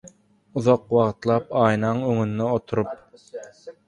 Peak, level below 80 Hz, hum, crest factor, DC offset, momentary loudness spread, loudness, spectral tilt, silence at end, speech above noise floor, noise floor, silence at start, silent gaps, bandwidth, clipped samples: -4 dBFS; -56 dBFS; none; 20 dB; under 0.1%; 20 LU; -22 LUFS; -7.5 dB/octave; 0.15 s; 29 dB; -51 dBFS; 0.05 s; none; 10.5 kHz; under 0.1%